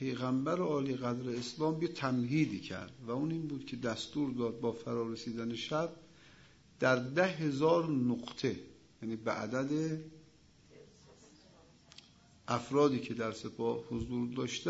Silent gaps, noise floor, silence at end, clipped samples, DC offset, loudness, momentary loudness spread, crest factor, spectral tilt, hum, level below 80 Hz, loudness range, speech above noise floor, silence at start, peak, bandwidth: none; -63 dBFS; 0 s; under 0.1%; under 0.1%; -35 LUFS; 10 LU; 22 dB; -5.5 dB/octave; none; -66 dBFS; 7 LU; 28 dB; 0 s; -14 dBFS; 7.6 kHz